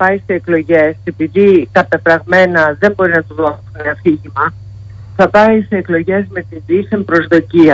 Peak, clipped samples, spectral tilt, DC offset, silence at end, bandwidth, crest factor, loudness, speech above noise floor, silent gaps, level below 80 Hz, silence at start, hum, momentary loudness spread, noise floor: 0 dBFS; under 0.1%; -8 dB/octave; under 0.1%; 0 s; 7.6 kHz; 12 dB; -12 LUFS; 19 dB; none; -44 dBFS; 0 s; none; 11 LU; -30 dBFS